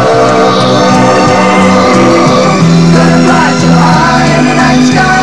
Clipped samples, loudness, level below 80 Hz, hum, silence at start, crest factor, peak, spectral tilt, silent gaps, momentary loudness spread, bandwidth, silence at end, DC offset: 4%; -5 LUFS; -32 dBFS; none; 0 s; 6 dB; 0 dBFS; -5.5 dB/octave; none; 1 LU; 11.5 kHz; 0 s; 3%